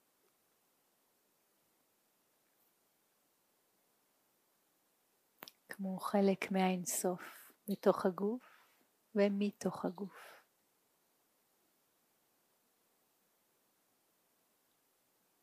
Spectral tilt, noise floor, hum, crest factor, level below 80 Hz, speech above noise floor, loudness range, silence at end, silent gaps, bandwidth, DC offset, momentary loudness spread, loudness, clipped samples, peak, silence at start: -5.5 dB/octave; -77 dBFS; none; 26 dB; -90 dBFS; 42 dB; 12 LU; 5.05 s; none; 15.5 kHz; under 0.1%; 19 LU; -36 LUFS; under 0.1%; -16 dBFS; 5.7 s